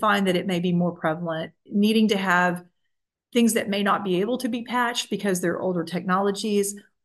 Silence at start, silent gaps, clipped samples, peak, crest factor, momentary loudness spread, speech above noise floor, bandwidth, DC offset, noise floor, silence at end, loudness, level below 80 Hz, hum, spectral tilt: 0 s; none; under 0.1%; -6 dBFS; 18 dB; 7 LU; 55 dB; 12.5 kHz; under 0.1%; -78 dBFS; 0.25 s; -24 LUFS; -72 dBFS; none; -5 dB/octave